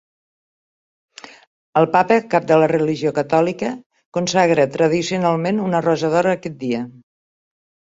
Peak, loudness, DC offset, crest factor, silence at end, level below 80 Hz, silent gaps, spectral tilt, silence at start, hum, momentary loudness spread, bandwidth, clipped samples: 0 dBFS; -18 LUFS; under 0.1%; 18 dB; 1 s; -60 dBFS; 3.86-3.90 s, 4.06-4.12 s; -6 dB/octave; 1.75 s; none; 10 LU; 8 kHz; under 0.1%